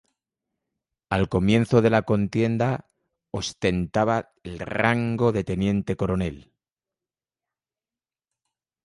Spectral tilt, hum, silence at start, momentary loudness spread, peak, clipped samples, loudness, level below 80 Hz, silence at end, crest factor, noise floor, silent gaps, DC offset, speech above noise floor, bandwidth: -7 dB/octave; none; 1.1 s; 12 LU; -4 dBFS; under 0.1%; -24 LUFS; -46 dBFS; 2.45 s; 20 dB; under -90 dBFS; none; under 0.1%; over 67 dB; 11.5 kHz